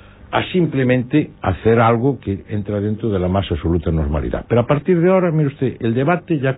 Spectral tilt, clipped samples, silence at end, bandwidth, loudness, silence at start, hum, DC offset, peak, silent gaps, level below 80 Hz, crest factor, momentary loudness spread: -12 dB/octave; under 0.1%; 0 s; 4 kHz; -18 LUFS; 0.25 s; none; under 0.1%; -2 dBFS; none; -34 dBFS; 14 dB; 8 LU